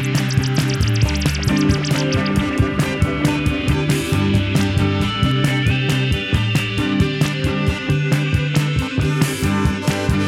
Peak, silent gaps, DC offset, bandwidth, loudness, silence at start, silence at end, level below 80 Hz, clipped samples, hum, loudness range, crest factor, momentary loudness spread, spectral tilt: -2 dBFS; none; under 0.1%; 16 kHz; -18 LUFS; 0 s; 0 s; -30 dBFS; under 0.1%; none; 1 LU; 14 dB; 2 LU; -5.5 dB/octave